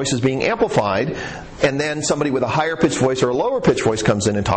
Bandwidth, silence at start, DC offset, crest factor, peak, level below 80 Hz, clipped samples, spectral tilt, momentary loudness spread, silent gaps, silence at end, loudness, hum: 9 kHz; 0 s; under 0.1%; 14 dB; -4 dBFS; -42 dBFS; under 0.1%; -5 dB/octave; 3 LU; none; 0 s; -19 LUFS; none